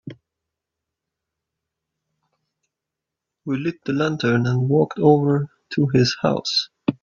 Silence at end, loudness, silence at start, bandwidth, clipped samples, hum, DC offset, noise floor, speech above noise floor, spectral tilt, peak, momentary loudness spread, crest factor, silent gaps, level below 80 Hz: 0.1 s; -20 LUFS; 0.05 s; 7.4 kHz; under 0.1%; none; under 0.1%; -85 dBFS; 66 dB; -6.5 dB/octave; -2 dBFS; 9 LU; 22 dB; none; -58 dBFS